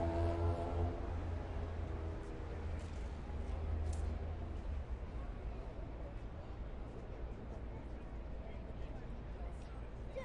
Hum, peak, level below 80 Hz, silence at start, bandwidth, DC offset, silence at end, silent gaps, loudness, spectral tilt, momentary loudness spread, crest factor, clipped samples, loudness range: none; -26 dBFS; -46 dBFS; 0 s; 10 kHz; under 0.1%; 0 s; none; -45 LUFS; -8 dB/octave; 10 LU; 16 dB; under 0.1%; 6 LU